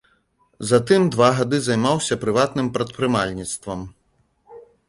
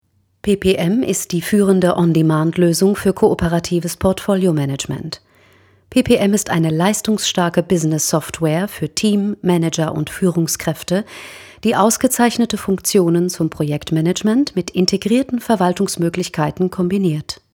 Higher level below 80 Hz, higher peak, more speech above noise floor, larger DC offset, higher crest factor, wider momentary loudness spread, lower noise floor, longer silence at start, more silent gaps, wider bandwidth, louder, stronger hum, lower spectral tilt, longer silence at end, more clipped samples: second, -52 dBFS vs -44 dBFS; about the same, -2 dBFS vs 0 dBFS; first, 45 dB vs 35 dB; neither; about the same, 20 dB vs 16 dB; first, 13 LU vs 7 LU; first, -64 dBFS vs -51 dBFS; first, 0.6 s vs 0.45 s; neither; second, 11.5 kHz vs 18.5 kHz; second, -20 LUFS vs -17 LUFS; neither; about the same, -5 dB/octave vs -5 dB/octave; about the same, 0.3 s vs 0.2 s; neither